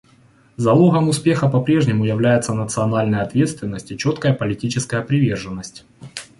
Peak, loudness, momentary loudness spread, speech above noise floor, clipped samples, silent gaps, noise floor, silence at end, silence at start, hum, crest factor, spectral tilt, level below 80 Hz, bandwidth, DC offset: -2 dBFS; -18 LUFS; 13 LU; 34 dB; under 0.1%; none; -52 dBFS; 0.15 s; 0.6 s; none; 16 dB; -6.5 dB/octave; -50 dBFS; 11.5 kHz; under 0.1%